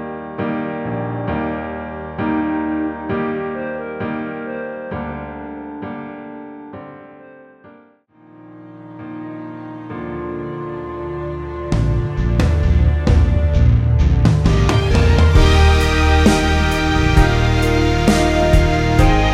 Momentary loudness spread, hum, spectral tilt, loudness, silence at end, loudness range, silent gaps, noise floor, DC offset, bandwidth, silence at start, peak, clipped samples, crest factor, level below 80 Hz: 17 LU; none; -6.5 dB/octave; -17 LUFS; 0 s; 20 LU; none; -49 dBFS; under 0.1%; 13 kHz; 0 s; 0 dBFS; under 0.1%; 16 dB; -20 dBFS